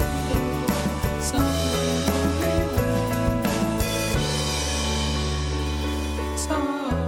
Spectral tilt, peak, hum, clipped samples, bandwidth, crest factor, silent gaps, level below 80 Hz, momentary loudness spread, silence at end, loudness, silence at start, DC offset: -4.5 dB/octave; -6 dBFS; none; under 0.1%; 17 kHz; 16 dB; none; -30 dBFS; 4 LU; 0 s; -24 LUFS; 0 s; under 0.1%